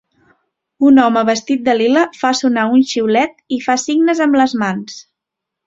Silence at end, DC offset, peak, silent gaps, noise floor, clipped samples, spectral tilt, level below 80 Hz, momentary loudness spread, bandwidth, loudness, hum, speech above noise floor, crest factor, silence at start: 0.65 s; under 0.1%; -2 dBFS; none; -81 dBFS; under 0.1%; -4 dB/octave; -60 dBFS; 9 LU; 7.8 kHz; -14 LUFS; none; 67 dB; 14 dB; 0.8 s